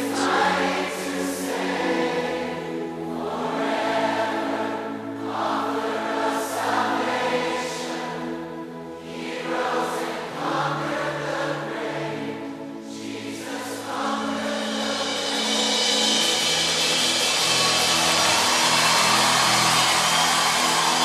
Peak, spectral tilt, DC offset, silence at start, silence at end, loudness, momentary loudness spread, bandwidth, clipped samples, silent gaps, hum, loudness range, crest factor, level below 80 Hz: -6 dBFS; -2 dB/octave; under 0.1%; 0 s; 0 s; -22 LUFS; 14 LU; 14 kHz; under 0.1%; none; none; 11 LU; 18 dB; -62 dBFS